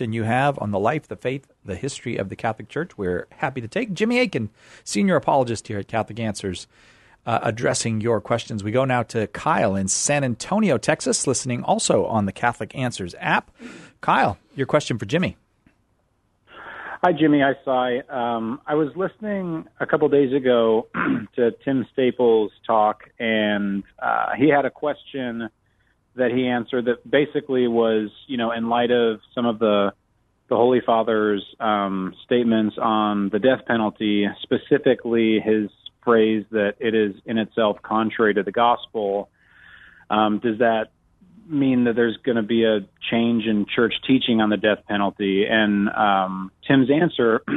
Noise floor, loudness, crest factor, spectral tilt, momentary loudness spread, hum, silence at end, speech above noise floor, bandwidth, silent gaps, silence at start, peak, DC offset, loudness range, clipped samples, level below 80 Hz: -66 dBFS; -21 LUFS; 18 dB; -5 dB/octave; 10 LU; none; 0 s; 45 dB; 11.5 kHz; none; 0 s; -2 dBFS; under 0.1%; 4 LU; under 0.1%; -58 dBFS